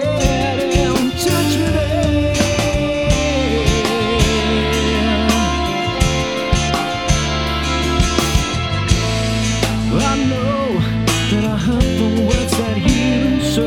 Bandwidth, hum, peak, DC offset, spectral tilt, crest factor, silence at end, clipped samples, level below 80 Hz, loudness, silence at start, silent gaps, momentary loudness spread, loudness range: 18 kHz; none; 0 dBFS; under 0.1%; -5 dB/octave; 16 dB; 0 s; under 0.1%; -24 dBFS; -16 LUFS; 0 s; none; 2 LU; 1 LU